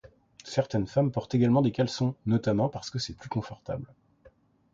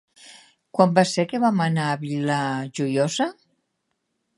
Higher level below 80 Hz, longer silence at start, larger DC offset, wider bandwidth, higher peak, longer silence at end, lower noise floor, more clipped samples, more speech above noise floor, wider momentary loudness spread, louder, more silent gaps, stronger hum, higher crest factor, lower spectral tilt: first, -56 dBFS vs -72 dBFS; first, 0.45 s vs 0.25 s; neither; second, 7.8 kHz vs 11.5 kHz; second, -12 dBFS vs -2 dBFS; second, 0.9 s vs 1.05 s; second, -60 dBFS vs -76 dBFS; neither; second, 33 dB vs 54 dB; first, 13 LU vs 8 LU; second, -29 LUFS vs -22 LUFS; neither; neither; second, 16 dB vs 22 dB; first, -7 dB/octave vs -5.5 dB/octave